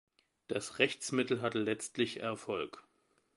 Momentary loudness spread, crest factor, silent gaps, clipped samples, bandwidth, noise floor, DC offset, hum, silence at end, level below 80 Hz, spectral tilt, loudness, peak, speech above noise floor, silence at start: 8 LU; 26 dB; none; under 0.1%; 11.5 kHz; -75 dBFS; under 0.1%; none; 0.55 s; -74 dBFS; -4 dB/octave; -35 LUFS; -10 dBFS; 40 dB; 0.5 s